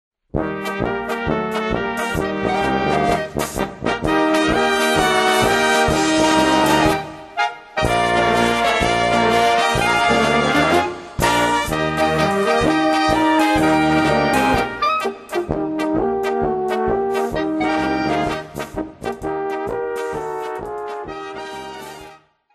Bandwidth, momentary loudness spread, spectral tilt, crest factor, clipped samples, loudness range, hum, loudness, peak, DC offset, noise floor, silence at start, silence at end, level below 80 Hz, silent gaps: 13 kHz; 12 LU; -4.5 dB/octave; 16 dB; under 0.1%; 7 LU; none; -18 LUFS; -2 dBFS; under 0.1%; -45 dBFS; 0.35 s; 0.4 s; -38 dBFS; none